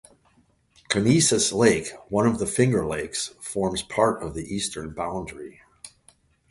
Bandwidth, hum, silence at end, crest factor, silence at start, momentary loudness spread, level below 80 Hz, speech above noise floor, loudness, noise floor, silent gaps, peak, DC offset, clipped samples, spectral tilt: 11.5 kHz; none; 0.65 s; 22 dB; 0.9 s; 18 LU; -50 dBFS; 39 dB; -24 LUFS; -62 dBFS; none; -4 dBFS; under 0.1%; under 0.1%; -4 dB/octave